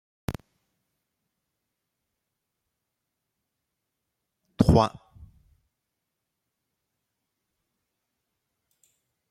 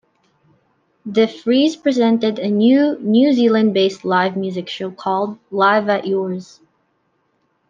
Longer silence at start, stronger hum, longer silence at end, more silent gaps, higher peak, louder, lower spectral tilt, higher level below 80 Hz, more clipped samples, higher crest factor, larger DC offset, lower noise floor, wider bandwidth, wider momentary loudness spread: second, 0.3 s vs 1.05 s; neither; first, 4.4 s vs 1.25 s; neither; about the same, -2 dBFS vs -2 dBFS; second, -24 LUFS vs -17 LUFS; first, -7.5 dB/octave vs -6 dB/octave; first, -46 dBFS vs -68 dBFS; neither; first, 30 dB vs 16 dB; neither; first, -83 dBFS vs -65 dBFS; first, 16 kHz vs 7.4 kHz; first, 18 LU vs 11 LU